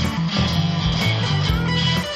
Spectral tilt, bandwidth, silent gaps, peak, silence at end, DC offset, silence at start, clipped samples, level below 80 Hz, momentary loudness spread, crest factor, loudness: -5.5 dB/octave; 14.5 kHz; none; -6 dBFS; 0 s; under 0.1%; 0 s; under 0.1%; -32 dBFS; 1 LU; 12 dB; -20 LUFS